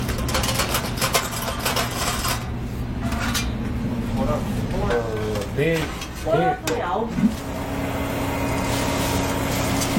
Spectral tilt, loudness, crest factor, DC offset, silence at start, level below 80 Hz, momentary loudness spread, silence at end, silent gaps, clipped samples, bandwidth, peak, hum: -4.5 dB/octave; -24 LUFS; 20 dB; under 0.1%; 0 s; -32 dBFS; 6 LU; 0 s; none; under 0.1%; 16.5 kHz; -4 dBFS; none